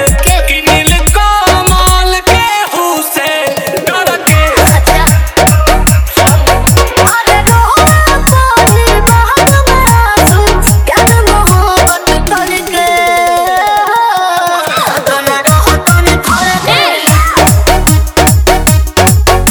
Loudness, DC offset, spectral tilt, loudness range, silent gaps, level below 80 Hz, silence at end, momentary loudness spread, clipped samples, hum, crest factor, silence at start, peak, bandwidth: -7 LUFS; 1%; -4 dB/octave; 3 LU; none; -14 dBFS; 0 s; 4 LU; 2%; none; 8 dB; 0 s; 0 dBFS; over 20 kHz